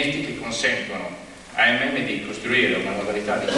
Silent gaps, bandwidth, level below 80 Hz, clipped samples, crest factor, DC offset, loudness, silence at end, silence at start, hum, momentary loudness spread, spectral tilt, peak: none; 12 kHz; -54 dBFS; under 0.1%; 18 dB; under 0.1%; -22 LUFS; 0 s; 0 s; none; 12 LU; -3.5 dB/octave; -6 dBFS